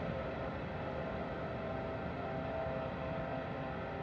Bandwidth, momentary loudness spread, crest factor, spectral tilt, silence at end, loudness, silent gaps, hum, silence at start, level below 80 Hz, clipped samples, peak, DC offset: 7.6 kHz; 2 LU; 14 dB; -8.5 dB/octave; 0 s; -40 LUFS; none; none; 0 s; -54 dBFS; under 0.1%; -26 dBFS; under 0.1%